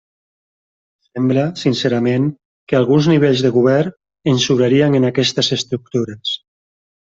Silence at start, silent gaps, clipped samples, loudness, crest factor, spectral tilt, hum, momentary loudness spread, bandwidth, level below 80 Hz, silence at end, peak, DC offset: 1.15 s; 2.45-2.67 s; under 0.1%; -16 LUFS; 16 dB; -6 dB/octave; none; 10 LU; 7.8 kHz; -56 dBFS; 0.65 s; -2 dBFS; under 0.1%